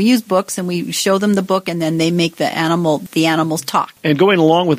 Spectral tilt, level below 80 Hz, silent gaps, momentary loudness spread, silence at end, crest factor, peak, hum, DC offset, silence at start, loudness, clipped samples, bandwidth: -5 dB/octave; -60 dBFS; none; 7 LU; 0 s; 14 dB; 0 dBFS; none; under 0.1%; 0 s; -16 LUFS; under 0.1%; 15.5 kHz